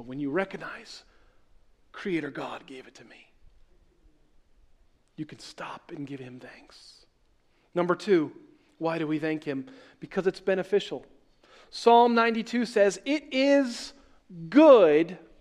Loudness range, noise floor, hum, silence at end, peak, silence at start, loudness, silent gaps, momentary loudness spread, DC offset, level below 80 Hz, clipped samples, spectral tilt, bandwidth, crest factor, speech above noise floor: 21 LU; -65 dBFS; none; 0.25 s; -4 dBFS; 0 s; -24 LUFS; none; 23 LU; under 0.1%; -64 dBFS; under 0.1%; -5.5 dB/octave; 11 kHz; 22 dB; 40 dB